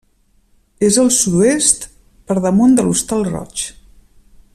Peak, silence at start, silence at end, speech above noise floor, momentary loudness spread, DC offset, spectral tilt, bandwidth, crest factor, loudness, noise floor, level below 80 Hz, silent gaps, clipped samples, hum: 0 dBFS; 0.8 s; 0.85 s; 42 dB; 12 LU; under 0.1%; -4 dB/octave; 14.5 kHz; 16 dB; -14 LUFS; -56 dBFS; -44 dBFS; none; under 0.1%; none